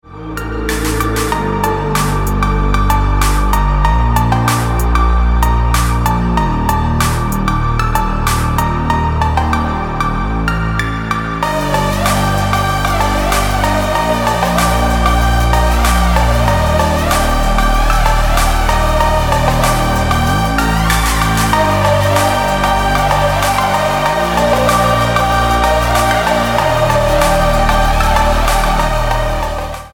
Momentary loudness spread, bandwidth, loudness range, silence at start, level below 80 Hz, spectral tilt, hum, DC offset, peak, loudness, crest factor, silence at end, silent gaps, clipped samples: 4 LU; 19.5 kHz; 3 LU; 0.1 s; -18 dBFS; -5 dB/octave; none; 0.2%; -2 dBFS; -14 LUFS; 10 dB; 0.05 s; none; under 0.1%